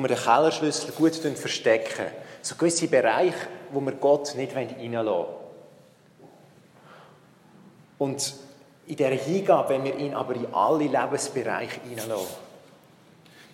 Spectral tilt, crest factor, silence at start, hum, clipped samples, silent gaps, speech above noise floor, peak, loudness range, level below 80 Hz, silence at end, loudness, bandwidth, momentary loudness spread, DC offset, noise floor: -4 dB/octave; 22 dB; 0 s; none; under 0.1%; none; 30 dB; -6 dBFS; 11 LU; -78 dBFS; 0.1 s; -25 LUFS; 16 kHz; 13 LU; under 0.1%; -55 dBFS